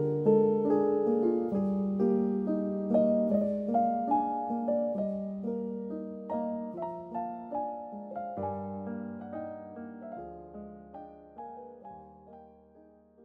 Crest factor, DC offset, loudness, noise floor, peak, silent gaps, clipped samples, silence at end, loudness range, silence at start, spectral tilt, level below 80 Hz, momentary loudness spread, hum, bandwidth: 18 dB; under 0.1%; -31 LUFS; -58 dBFS; -12 dBFS; none; under 0.1%; 0.45 s; 16 LU; 0 s; -11.5 dB/octave; -68 dBFS; 20 LU; none; 3.4 kHz